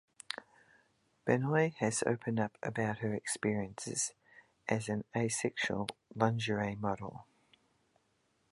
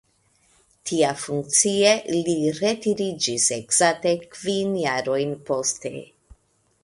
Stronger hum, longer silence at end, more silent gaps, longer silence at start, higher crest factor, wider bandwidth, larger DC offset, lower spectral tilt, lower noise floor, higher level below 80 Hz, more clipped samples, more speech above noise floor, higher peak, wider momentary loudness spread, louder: neither; first, 1.3 s vs 0.8 s; neither; second, 0.3 s vs 0.85 s; about the same, 22 dB vs 20 dB; about the same, 11.5 kHz vs 11.5 kHz; neither; first, -4.5 dB/octave vs -3 dB/octave; first, -76 dBFS vs -65 dBFS; second, -68 dBFS vs -62 dBFS; neither; about the same, 42 dB vs 42 dB; second, -14 dBFS vs -4 dBFS; first, 12 LU vs 9 LU; second, -35 LUFS vs -22 LUFS